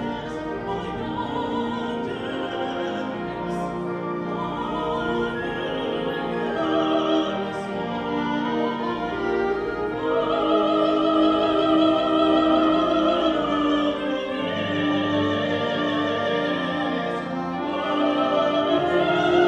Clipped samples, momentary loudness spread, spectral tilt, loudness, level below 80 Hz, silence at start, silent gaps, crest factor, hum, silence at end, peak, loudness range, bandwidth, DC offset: under 0.1%; 9 LU; -6.5 dB/octave; -23 LUFS; -50 dBFS; 0 s; none; 16 dB; none; 0 s; -6 dBFS; 8 LU; 8.6 kHz; under 0.1%